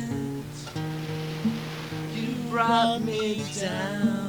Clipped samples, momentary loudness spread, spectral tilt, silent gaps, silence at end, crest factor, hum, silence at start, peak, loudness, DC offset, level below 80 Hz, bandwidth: under 0.1%; 11 LU; -5.5 dB/octave; none; 0 s; 18 dB; 60 Hz at -45 dBFS; 0 s; -10 dBFS; -28 LUFS; under 0.1%; -56 dBFS; over 20 kHz